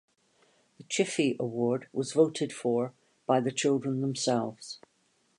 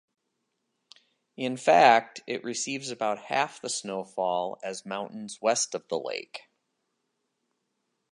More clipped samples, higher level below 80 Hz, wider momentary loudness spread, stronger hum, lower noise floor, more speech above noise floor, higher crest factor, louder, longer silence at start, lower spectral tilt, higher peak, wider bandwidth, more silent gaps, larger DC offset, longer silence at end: neither; first, -78 dBFS vs -84 dBFS; second, 11 LU vs 16 LU; neither; second, -71 dBFS vs -80 dBFS; second, 42 dB vs 52 dB; second, 20 dB vs 26 dB; about the same, -29 LUFS vs -27 LUFS; second, 0.8 s vs 1.4 s; first, -5 dB/octave vs -2.5 dB/octave; second, -12 dBFS vs -4 dBFS; about the same, 11 kHz vs 11.5 kHz; neither; neither; second, 0.6 s vs 1.75 s